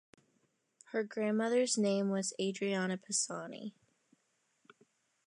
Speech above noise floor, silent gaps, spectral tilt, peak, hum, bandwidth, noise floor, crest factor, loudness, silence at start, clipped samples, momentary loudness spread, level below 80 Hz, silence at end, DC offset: 44 dB; none; -4 dB/octave; -20 dBFS; none; 11 kHz; -78 dBFS; 18 dB; -34 LUFS; 0.9 s; under 0.1%; 12 LU; -88 dBFS; 1.6 s; under 0.1%